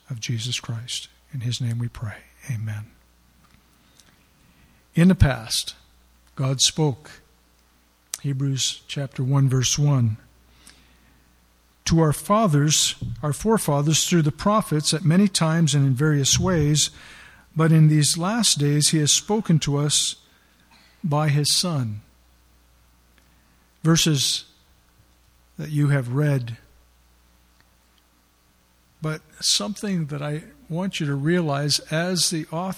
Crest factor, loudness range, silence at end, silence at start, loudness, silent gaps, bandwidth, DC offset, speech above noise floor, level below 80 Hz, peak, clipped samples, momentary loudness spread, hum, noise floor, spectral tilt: 22 dB; 9 LU; 0 s; 0.1 s; -21 LUFS; none; 15.5 kHz; under 0.1%; 39 dB; -44 dBFS; -2 dBFS; under 0.1%; 13 LU; none; -60 dBFS; -4.5 dB/octave